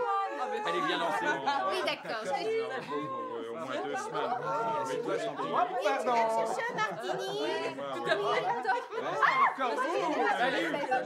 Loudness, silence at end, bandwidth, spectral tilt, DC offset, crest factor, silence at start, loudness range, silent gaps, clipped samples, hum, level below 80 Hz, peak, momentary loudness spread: -31 LUFS; 0 s; 15.5 kHz; -3.5 dB/octave; under 0.1%; 18 dB; 0 s; 4 LU; none; under 0.1%; none; under -90 dBFS; -14 dBFS; 7 LU